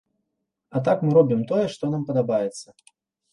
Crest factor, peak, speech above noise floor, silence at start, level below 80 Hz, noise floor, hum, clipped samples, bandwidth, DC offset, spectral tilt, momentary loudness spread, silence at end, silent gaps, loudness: 18 dB; -6 dBFS; 57 dB; 0.75 s; -66 dBFS; -79 dBFS; none; under 0.1%; 11.5 kHz; under 0.1%; -7.5 dB/octave; 12 LU; 0.7 s; none; -22 LUFS